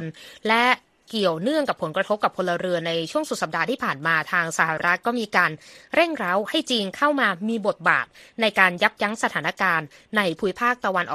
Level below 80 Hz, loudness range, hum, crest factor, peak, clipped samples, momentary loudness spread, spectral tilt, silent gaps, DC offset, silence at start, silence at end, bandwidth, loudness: -66 dBFS; 2 LU; none; 22 dB; 0 dBFS; under 0.1%; 6 LU; -4 dB/octave; none; under 0.1%; 0 s; 0 s; 14.5 kHz; -22 LUFS